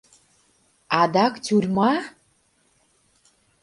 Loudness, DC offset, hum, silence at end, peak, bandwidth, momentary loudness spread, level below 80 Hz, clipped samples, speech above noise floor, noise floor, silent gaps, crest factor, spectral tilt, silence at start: -21 LUFS; under 0.1%; none; 1.55 s; 0 dBFS; 11.5 kHz; 7 LU; -64 dBFS; under 0.1%; 44 dB; -64 dBFS; none; 24 dB; -5.5 dB/octave; 0.9 s